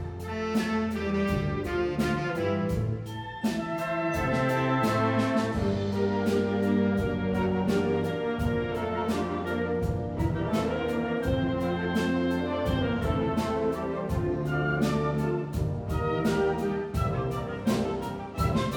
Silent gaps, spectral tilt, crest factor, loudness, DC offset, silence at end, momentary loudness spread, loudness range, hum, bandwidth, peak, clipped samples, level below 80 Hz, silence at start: none; -7 dB/octave; 14 dB; -28 LUFS; under 0.1%; 0 s; 5 LU; 3 LU; none; 19 kHz; -14 dBFS; under 0.1%; -42 dBFS; 0 s